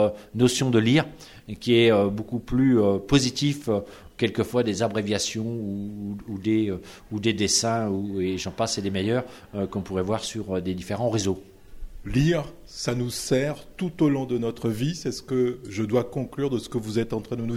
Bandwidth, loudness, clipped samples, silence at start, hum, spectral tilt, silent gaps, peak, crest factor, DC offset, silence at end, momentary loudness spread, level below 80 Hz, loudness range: 16 kHz; -25 LUFS; under 0.1%; 0 s; none; -5 dB/octave; none; -6 dBFS; 20 dB; under 0.1%; 0 s; 11 LU; -48 dBFS; 5 LU